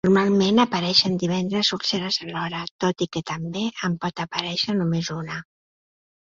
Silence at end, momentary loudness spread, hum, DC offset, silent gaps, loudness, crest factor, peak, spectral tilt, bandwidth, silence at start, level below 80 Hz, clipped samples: 0.8 s; 11 LU; none; under 0.1%; 2.71-2.79 s; -23 LUFS; 20 dB; -4 dBFS; -5 dB/octave; 7.6 kHz; 0.05 s; -58 dBFS; under 0.1%